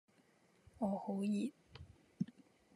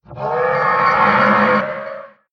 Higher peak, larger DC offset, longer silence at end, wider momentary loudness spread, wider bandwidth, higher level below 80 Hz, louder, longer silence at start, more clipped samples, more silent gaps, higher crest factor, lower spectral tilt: second, -26 dBFS vs -2 dBFS; neither; first, 0.5 s vs 0.25 s; first, 20 LU vs 15 LU; first, 11.5 kHz vs 7.4 kHz; second, -74 dBFS vs -52 dBFS; second, -42 LUFS vs -15 LUFS; first, 0.8 s vs 0.1 s; neither; neither; about the same, 18 dB vs 14 dB; about the same, -7.5 dB/octave vs -7 dB/octave